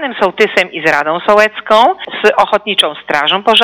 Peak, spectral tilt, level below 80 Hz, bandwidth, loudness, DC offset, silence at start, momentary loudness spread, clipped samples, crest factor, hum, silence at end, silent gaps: 0 dBFS; -3 dB/octave; -52 dBFS; 17.5 kHz; -11 LUFS; under 0.1%; 0 s; 3 LU; 0.9%; 12 dB; none; 0 s; none